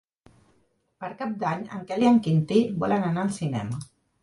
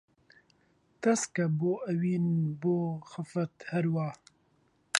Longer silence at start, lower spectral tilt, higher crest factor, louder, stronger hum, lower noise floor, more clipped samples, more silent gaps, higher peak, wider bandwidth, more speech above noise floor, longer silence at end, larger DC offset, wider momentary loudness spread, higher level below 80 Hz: about the same, 1 s vs 1 s; first, -7.5 dB/octave vs -5.5 dB/octave; second, 18 dB vs 24 dB; first, -25 LUFS vs -31 LUFS; neither; about the same, -68 dBFS vs -69 dBFS; neither; neither; about the same, -8 dBFS vs -8 dBFS; about the same, 11.5 kHz vs 11.5 kHz; first, 43 dB vs 39 dB; first, 0.4 s vs 0 s; neither; first, 14 LU vs 7 LU; first, -62 dBFS vs -74 dBFS